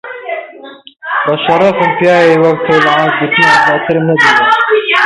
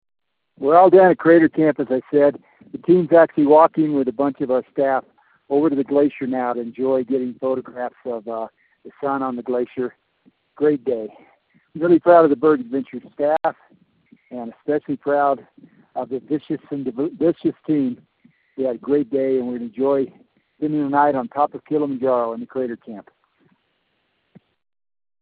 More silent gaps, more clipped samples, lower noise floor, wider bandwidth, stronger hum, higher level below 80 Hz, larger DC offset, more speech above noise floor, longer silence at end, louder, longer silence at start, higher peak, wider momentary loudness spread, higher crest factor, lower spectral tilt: neither; neither; second, -32 dBFS vs -69 dBFS; first, 11.5 kHz vs 4.5 kHz; neither; first, -52 dBFS vs -66 dBFS; neither; second, 24 dB vs 50 dB; second, 0 s vs 2.2 s; first, -9 LUFS vs -19 LUFS; second, 0.05 s vs 0.6 s; about the same, 0 dBFS vs 0 dBFS; second, 13 LU vs 16 LU; second, 10 dB vs 20 dB; second, -5 dB/octave vs -6.5 dB/octave